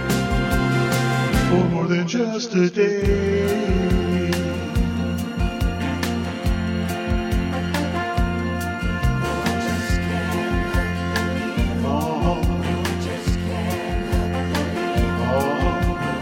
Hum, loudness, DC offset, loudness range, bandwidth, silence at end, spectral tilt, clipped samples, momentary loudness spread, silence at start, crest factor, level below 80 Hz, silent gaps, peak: none; -22 LUFS; under 0.1%; 4 LU; 16.5 kHz; 0 s; -6 dB/octave; under 0.1%; 5 LU; 0 s; 14 dB; -28 dBFS; none; -6 dBFS